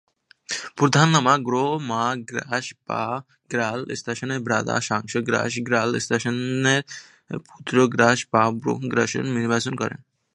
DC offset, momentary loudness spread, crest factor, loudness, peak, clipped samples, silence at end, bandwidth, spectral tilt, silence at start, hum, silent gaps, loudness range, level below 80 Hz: under 0.1%; 12 LU; 22 dB; -22 LUFS; 0 dBFS; under 0.1%; 0.4 s; 11.5 kHz; -4.5 dB/octave; 0.5 s; none; none; 4 LU; -64 dBFS